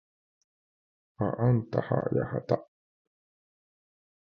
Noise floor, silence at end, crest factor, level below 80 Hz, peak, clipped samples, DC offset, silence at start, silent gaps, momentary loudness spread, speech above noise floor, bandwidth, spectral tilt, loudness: under -90 dBFS; 1.7 s; 22 dB; -60 dBFS; -10 dBFS; under 0.1%; under 0.1%; 1.2 s; none; 6 LU; over 62 dB; 5.8 kHz; -10.5 dB/octave; -29 LUFS